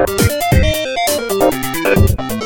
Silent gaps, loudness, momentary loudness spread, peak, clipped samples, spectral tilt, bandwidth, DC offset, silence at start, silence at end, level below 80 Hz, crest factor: none; -14 LUFS; 3 LU; 0 dBFS; under 0.1%; -5 dB/octave; 17 kHz; under 0.1%; 0 s; 0 s; -24 dBFS; 14 dB